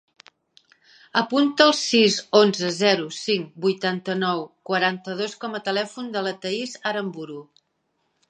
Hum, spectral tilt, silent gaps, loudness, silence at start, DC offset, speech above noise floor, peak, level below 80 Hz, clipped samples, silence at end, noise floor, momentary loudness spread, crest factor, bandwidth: none; -4 dB/octave; none; -22 LUFS; 1.15 s; under 0.1%; 50 dB; -2 dBFS; -76 dBFS; under 0.1%; 0.85 s; -73 dBFS; 12 LU; 22 dB; 9.8 kHz